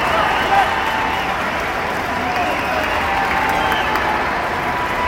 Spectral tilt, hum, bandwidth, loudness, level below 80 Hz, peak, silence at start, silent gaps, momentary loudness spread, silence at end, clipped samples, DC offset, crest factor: -4 dB/octave; none; 17 kHz; -18 LUFS; -38 dBFS; -2 dBFS; 0 s; none; 5 LU; 0 s; under 0.1%; under 0.1%; 16 dB